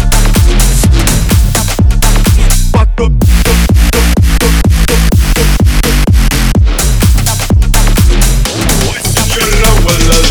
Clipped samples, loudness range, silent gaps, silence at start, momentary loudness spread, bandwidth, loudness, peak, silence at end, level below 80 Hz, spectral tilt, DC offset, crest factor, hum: 1%; 1 LU; none; 0 s; 2 LU; over 20 kHz; -9 LUFS; 0 dBFS; 0 s; -8 dBFS; -4.5 dB/octave; under 0.1%; 6 dB; none